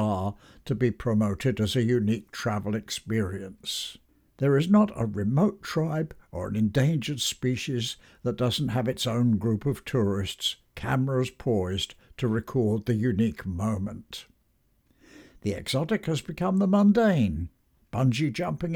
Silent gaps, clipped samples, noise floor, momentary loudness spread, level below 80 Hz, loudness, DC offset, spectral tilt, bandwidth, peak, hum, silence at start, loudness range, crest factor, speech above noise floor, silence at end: none; under 0.1%; -68 dBFS; 11 LU; -52 dBFS; -27 LUFS; under 0.1%; -6 dB/octave; 18 kHz; -10 dBFS; none; 0 s; 4 LU; 18 dB; 42 dB; 0 s